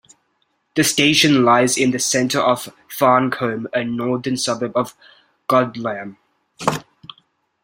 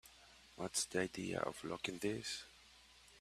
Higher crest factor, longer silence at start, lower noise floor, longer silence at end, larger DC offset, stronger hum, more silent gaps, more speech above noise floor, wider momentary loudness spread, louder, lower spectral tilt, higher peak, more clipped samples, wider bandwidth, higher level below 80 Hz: second, 18 dB vs 24 dB; first, 0.75 s vs 0.05 s; about the same, -67 dBFS vs -64 dBFS; first, 0.8 s vs 0 s; neither; neither; neither; first, 49 dB vs 22 dB; second, 14 LU vs 23 LU; first, -18 LUFS vs -42 LUFS; about the same, -3.5 dB/octave vs -3 dB/octave; first, -2 dBFS vs -20 dBFS; neither; about the same, 16.5 kHz vs 15 kHz; first, -58 dBFS vs -72 dBFS